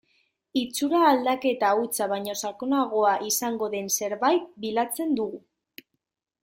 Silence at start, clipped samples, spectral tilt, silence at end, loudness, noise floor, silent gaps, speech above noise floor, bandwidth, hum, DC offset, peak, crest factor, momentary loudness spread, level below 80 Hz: 0.55 s; under 0.1%; -2.5 dB/octave; 1.05 s; -25 LUFS; -69 dBFS; none; 45 dB; 16.5 kHz; none; under 0.1%; -6 dBFS; 20 dB; 9 LU; -72 dBFS